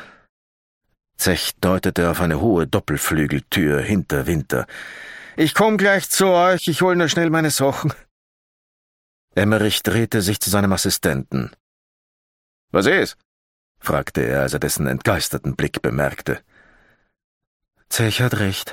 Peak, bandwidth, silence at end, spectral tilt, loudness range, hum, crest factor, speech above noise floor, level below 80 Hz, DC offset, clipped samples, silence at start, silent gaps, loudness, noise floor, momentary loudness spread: -2 dBFS; 17 kHz; 0 s; -4.5 dB/octave; 6 LU; none; 18 dB; 37 dB; -42 dBFS; under 0.1%; under 0.1%; 0 s; 0.29-0.81 s, 8.11-9.28 s, 11.60-12.68 s, 13.25-13.75 s, 17.24-17.41 s, 17.47-17.60 s; -19 LUFS; -56 dBFS; 10 LU